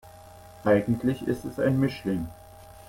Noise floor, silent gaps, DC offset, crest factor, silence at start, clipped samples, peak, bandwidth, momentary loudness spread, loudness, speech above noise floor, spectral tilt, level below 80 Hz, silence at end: -48 dBFS; none; under 0.1%; 18 dB; 0.05 s; under 0.1%; -10 dBFS; 16.5 kHz; 8 LU; -26 LUFS; 23 dB; -8 dB/octave; -52 dBFS; 0.05 s